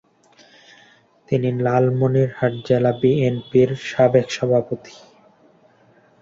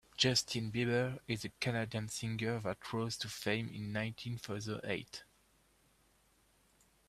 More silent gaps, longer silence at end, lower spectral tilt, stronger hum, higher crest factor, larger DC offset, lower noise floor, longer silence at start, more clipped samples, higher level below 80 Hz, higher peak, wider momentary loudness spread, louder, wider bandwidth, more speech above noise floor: neither; second, 1.35 s vs 1.85 s; first, -7.5 dB/octave vs -4 dB/octave; neither; about the same, 18 dB vs 22 dB; neither; second, -55 dBFS vs -71 dBFS; first, 1.3 s vs 0.2 s; neither; first, -56 dBFS vs -68 dBFS; first, -2 dBFS vs -16 dBFS; second, 6 LU vs 9 LU; first, -19 LUFS vs -37 LUFS; second, 7.6 kHz vs 14.5 kHz; about the same, 36 dB vs 34 dB